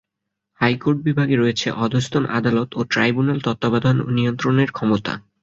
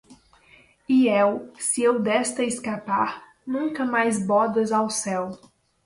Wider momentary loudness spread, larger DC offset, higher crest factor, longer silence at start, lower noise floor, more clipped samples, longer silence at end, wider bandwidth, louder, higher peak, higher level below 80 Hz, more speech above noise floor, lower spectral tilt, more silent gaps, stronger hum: second, 3 LU vs 9 LU; neither; about the same, 16 dB vs 16 dB; first, 0.6 s vs 0.1 s; first, -80 dBFS vs -55 dBFS; neither; second, 0.25 s vs 0.5 s; second, 7.8 kHz vs 11.5 kHz; first, -20 LUFS vs -23 LUFS; first, -2 dBFS vs -8 dBFS; first, -54 dBFS vs -66 dBFS; first, 61 dB vs 33 dB; first, -6.5 dB/octave vs -4 dB/octave; neither; neither